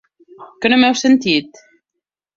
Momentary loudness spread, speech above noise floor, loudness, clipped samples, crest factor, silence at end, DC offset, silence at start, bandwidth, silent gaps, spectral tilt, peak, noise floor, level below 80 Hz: 6 LU; 66 dB; -14 LUFS; under 0.1%; 16 dB; 0.9 s; under 0.1%; 0.4 s; 7.6 kHz; none; -3.5 dB/octave; -2 dBFS; -80 dBFS; -58 dBFS